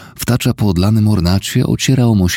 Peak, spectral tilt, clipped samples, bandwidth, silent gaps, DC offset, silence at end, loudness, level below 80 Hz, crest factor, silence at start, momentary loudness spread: 0 dBFS; -5.5 dB/octave; under 0.1%; 17 kHz; none; under 0.1%; 0 s; -14 LUFS; -32 dBFS; 12 dB; 0 s; 4 LU